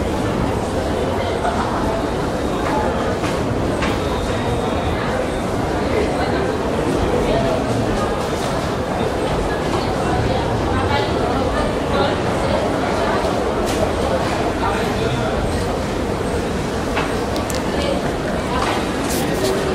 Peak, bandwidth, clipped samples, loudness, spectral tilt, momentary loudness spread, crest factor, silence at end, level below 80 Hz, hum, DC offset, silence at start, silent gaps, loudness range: -4 dBFS; 16 kHz; under 0.1%; -20 LUFS; -5.5 dB/octave; 3 LU; 16 dB; 0 s; -30 dBFS; none; under 0.1%; 0 s; none; 2 LU